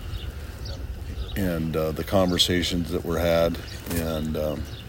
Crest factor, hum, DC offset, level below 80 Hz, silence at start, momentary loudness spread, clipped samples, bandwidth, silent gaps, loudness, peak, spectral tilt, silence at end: 18 dB; none; under 0.1%; -36 dBFS; 0 s; 15 LU; under 0.1%; 16.5 kHz; none; -26 LUFS; -6 dBFS; -5 dB/octave; 0 s